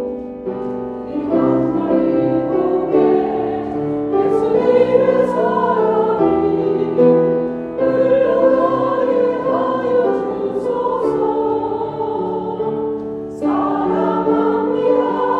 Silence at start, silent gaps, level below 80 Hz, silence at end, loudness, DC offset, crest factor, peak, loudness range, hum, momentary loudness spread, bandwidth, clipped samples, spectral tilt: 0 s; none; -50 dBFS; 0 s; -17 LUFS; under 0.1%; 16 dB; -2 dBFS; 4 LU; none; 9 LU; 5.6 kHz; under 0.1%; -9 dB/octave